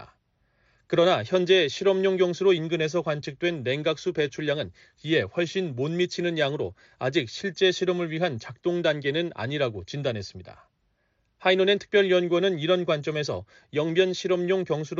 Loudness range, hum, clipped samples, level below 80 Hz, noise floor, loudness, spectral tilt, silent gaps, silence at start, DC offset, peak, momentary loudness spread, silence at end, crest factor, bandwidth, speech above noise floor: 4 LU; none; under 0.1%; -66 dBFS; -71 dBFS; -25 LUFS; -4 dB/octave; none; 0 s; under 0.1%; -8 dBFS; 9 LU; 0 s; 16 dB; 7.6 kHz; 46 dB